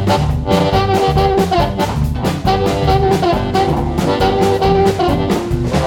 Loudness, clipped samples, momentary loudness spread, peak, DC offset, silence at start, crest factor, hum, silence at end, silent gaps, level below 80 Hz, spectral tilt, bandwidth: -14 LUFS; under 0.1%; 4 LU; 0 dBFS; under 0.1%; 0 s; 14 dB; none; 0 s; none; -24 dBFS; -6.5 dB/octave; 18 kHz